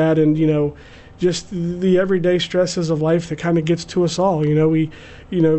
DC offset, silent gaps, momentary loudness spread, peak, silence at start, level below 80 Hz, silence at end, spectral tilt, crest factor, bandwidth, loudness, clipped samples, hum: under 0.1%; none; 6 LU; -6 dBFS; 0 s; -46 dBFS; 0 s; -6.5 dB/octave; 12 dB; 8.4 kHz; -18 LUFS; under 0.1%; none